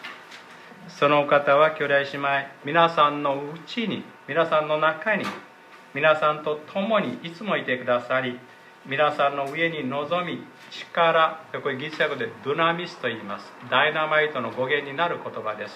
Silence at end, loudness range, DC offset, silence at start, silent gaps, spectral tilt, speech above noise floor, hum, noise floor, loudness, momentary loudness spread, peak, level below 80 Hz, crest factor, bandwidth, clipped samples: 0 s; 4 LU; under 0.1%; 0 s; none; -5.5 dB/octave; 21 dB; none; -45 dBFS; -24 LUFS; 14 LU; -4 dBFS; -76 dBFS; 20 dB; 12 kHz; under 0.1%